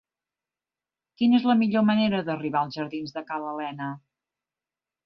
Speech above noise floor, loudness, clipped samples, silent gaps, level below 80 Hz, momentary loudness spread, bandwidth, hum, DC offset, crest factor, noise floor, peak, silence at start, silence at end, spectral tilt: over 66 dB; -25 LUFS; under 0.1%; none; -68 dBFS; 13 LU; 6 kHz; none; under 0.1%; 16 dB; under -90 dBFS; -10 dBFS; 1.2 s; 1.05 s; -7.5 dB/octave